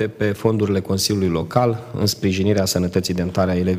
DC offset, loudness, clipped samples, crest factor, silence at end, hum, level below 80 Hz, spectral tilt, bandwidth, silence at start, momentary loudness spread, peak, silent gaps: under 0.1%; -20 LUFS; under 0.1%; 16 dB; 0 s; none; -46 dBFS; -5.5 dB/octave; 16 kHz; 0 s; 3 LU; -2 dBFS; none